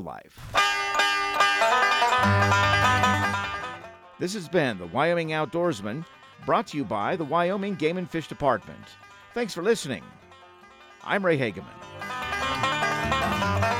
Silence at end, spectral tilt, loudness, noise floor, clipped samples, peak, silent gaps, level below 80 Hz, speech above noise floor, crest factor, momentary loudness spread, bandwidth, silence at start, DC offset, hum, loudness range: 0 s; -4.5 dB/octave; -24 LUFS; -50 dBFS; under 0.1%; -8 dBFS; none; -52 dBFS; 24 dB; 18 dB; 16 LU; 16.5 kHz; 0 s; under 0.1%; none; 8 LU